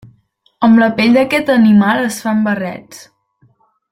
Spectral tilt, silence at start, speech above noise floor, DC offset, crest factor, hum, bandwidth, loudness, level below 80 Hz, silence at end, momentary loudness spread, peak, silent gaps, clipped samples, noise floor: -6 dB/octave; 0.6 s; 44 dB; under 0.1%; 12 dB; none; 15.5 kHz; -12 LUFS; -54 dBFS; 0.95 s; 10 LU; 0 dBFS; none; under 0.1%; -55 dBFS